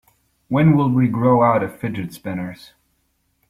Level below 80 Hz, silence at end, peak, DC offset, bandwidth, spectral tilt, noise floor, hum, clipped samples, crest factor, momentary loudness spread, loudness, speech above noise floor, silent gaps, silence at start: -52 dBFS; 0.95 s; -2 dBFS; under 0.1%; 14.5 kHz; -9 dB/octave; -67 dBFS; none; under 0.1%; 16 dB; 13 LU; -18 LUFS; 49 dB; none; 0.5 s